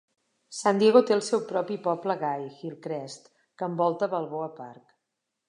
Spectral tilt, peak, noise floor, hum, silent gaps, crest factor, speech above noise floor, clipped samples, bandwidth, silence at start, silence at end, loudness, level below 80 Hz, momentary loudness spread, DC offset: -5 dB/octave; -4 dBFS; -83 dBFS; none; none; 24 dB; 56 dB; under 0.1%; 11 kHz; 0.5 s; 0.75 s; -26 LUFS; -82 dBFS; 20 LU; under 0.1%